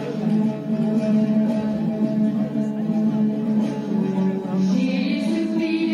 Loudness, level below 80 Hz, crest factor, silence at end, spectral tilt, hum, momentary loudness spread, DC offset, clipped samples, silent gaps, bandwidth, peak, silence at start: -22 LUFS; -62 dBFS; 12 dB; 0 s; -8 dB/octave; none; 4 LU; under 0.1%; under 0.1%; none; 9.8 kHz; -10 dBFS; 0 s